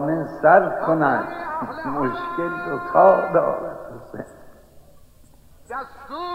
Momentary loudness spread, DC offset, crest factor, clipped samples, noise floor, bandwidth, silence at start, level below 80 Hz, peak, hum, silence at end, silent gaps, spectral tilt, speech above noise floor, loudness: 21 LU; under 0.1%; 20 dB; under 0.1%; -49 dBFS; 15 kHz; 0 s; -54 dBFS; -2 dBFS; none; 0 s; none; -8 dB/octave; 29 dB; -20 LUFS